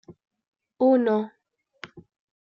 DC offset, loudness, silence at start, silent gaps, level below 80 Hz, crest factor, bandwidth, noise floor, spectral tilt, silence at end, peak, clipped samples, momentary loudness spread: under 0.1%; -22 LUFS; 0.1 s; 0.48-0.52 s; -76 dBFS; 16 dB; 6.8 kHz; -48 dBFS; -8 dB/octave; 0.4 s; -10 dBFS; under 0.1%; 24 LU